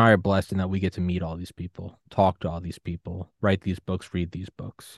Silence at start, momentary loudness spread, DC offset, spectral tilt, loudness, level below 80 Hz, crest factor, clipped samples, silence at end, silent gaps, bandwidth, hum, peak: 0 s; 14 LU; under 0.1%; -7.5 dB/octave; -27 LUFS; -52 dBFS; 22 dB; under 0.1%; 0 s; none; 12.5 kHz; none; -4 dBFS